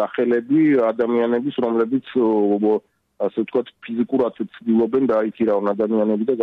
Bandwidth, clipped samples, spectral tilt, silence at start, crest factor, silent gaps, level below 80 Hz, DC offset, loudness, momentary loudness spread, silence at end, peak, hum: 4.6 kHz; under 0.1%; -9.5 dB/octave; 0 s; 10 dB; none; -66 dBFS; under 0.1%; -20 LUFS; 8 LU; 0 s; -8 dBFS; none